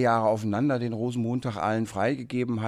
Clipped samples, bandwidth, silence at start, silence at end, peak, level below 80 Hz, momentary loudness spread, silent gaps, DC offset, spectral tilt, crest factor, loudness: under 0.1%; 13 kHz; 0 s; 0 s; -10 dBFS; -62 dBFS; 5 LU; none; under 0.1%; -7 dB/octave; 16 dB; -27 LUFS